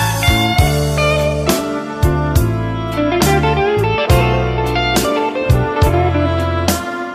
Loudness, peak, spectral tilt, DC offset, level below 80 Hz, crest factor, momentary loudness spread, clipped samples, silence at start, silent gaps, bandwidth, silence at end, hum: -15 LUFS; -2 dBFS; -5.5 dB/octave; under 0.1%; -24 dBFS; 12 dB; 5 LU; under 0.1%; 0 s; none; 15.5 kHz; 0 s; none